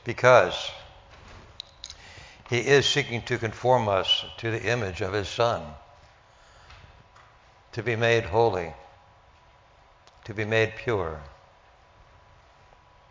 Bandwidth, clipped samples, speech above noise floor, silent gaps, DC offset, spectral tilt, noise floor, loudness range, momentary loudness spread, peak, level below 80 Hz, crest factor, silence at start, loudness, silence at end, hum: 7.6 kHz; under 0.1%; 32 dB; none; under 0.1%; -4.5 dB/octave; -57 dBFS; 7 LU; 22 LU; -2 dBFS; -52 dBFS; 26 dB; 0.05 s; -24 LUFS; 1.8 s; none